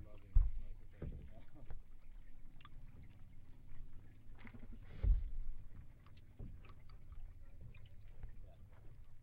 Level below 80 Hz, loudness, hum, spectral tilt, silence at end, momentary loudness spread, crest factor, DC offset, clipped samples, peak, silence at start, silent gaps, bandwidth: -44 dBFS; -48 LUFS; none; -8.5 dB/octave; 0 s; 23 LU; 24 dB; under 0.1%; under 0.1%; -18 dBFS; 0 s; none; 3.8 kHz